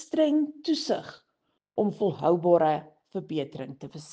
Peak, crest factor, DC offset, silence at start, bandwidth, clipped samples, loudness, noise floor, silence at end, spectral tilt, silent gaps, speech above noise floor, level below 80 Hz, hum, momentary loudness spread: -8 dBFS; 20 dB; under 0.1%; 0 s; 9 kHz; under 0.1%; -27 LUFS; -77 dBFS; 0 s; -6.5 dB/octave; none; 51 dB; -72 dBFS; none; 17 LU